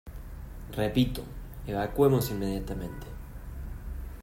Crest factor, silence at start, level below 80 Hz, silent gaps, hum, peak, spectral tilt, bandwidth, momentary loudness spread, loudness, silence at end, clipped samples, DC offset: 22 dB; 0.05 s; -40 dBFS; none; none; -10 dBFS; -6.5 dB/octave; 16 kHz; 20 LU; -30 LUFS; 0 s; under 0.1%; under 0.1%